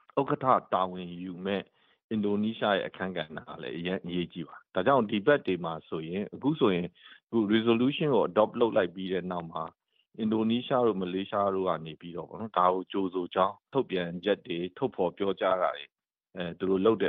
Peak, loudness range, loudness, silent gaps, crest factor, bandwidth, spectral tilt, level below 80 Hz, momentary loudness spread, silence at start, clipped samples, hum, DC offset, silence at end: -8 dBFS; 4 LU; -29 LUFS; 2.04-2.09 s; 20 dB; 4.5 kHz; -4.5 dB/octave; -68 dBFS; 13 LU; 0.15 s; under 0.1%; none; under 0.1%; 0 s